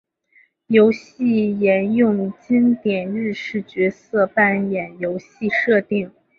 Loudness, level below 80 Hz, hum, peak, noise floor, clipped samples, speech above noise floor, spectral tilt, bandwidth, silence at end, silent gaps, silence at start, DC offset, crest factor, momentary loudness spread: -19 LUFS; -62 dBFS; none; -2 dBFS; -57 dBFS; under 0.1%; 39 dB; -8 dB/octave; 6.8 kHz; 0.3 s; none; 0.7 s; under 0.1%; 18 dB; 9 LU